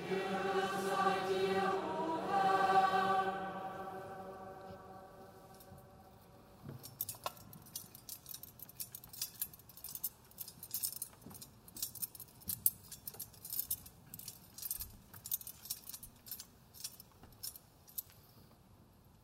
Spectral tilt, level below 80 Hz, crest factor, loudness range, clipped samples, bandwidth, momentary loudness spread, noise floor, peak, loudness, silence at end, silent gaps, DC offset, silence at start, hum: -3 dB/octave; -70 dBFS; 32 dB; 15 LU; under 0.1%; 16 kHz; 20 LU; -63 dBFS; -8 dBFS; -39 LUFS; 0.4 s; none; under 0.1%; 0 s; none